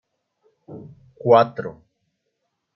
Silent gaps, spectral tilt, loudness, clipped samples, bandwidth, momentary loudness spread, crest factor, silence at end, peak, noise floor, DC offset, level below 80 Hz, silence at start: none; -8.5 dB/octave; -18 LUFS; under 0.1%; 6 kHz; 25 LU; 22 dB; 1.05 s; -2 dBFS; -76 dBFS; under 0.1%; -66 dBFS; 0.7 s